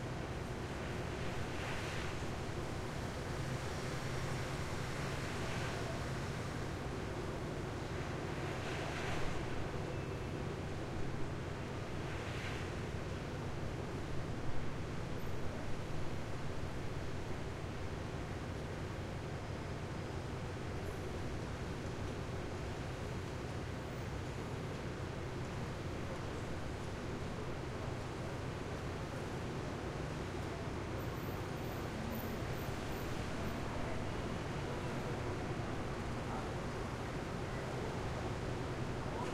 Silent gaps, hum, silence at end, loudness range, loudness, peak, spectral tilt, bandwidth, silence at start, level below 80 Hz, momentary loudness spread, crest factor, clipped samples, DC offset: none; none; 0 s; 2 LU; -42 LUFS; -24 dBFS; -6 dB/octave; 15.5 kHz; 0 s; -50 dBFS; 3 LU; 16 dB; under 0.1%; under 0.1%